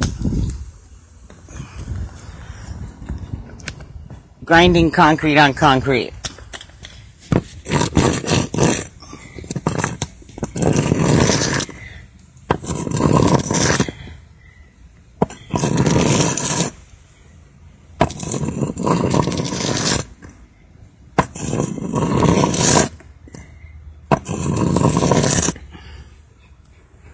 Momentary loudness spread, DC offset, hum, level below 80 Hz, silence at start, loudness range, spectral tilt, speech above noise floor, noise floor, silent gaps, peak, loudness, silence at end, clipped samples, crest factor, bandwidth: 22 LU; under 0.1%; none; -34 dBFS; 0 s; 6 LU; -4.5 dB/octave; 34 dB; -47 dBFS; none; 0 dBFS; -18 LUFS; 0.05 s; under 0.1%; 20 dB; 8 kHz